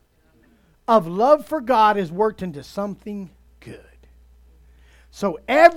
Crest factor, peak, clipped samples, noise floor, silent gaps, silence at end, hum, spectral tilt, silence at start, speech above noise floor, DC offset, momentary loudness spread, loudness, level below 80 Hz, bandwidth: 22 dB; 0 dBFS; under 0.1%; -58 dBFS; none; 0 s; none; -6 dB/octave; 0.9 s; 39 dB; under 0.1%; 21 LU; -20 LUFS; -52 dBFS; 16 kHz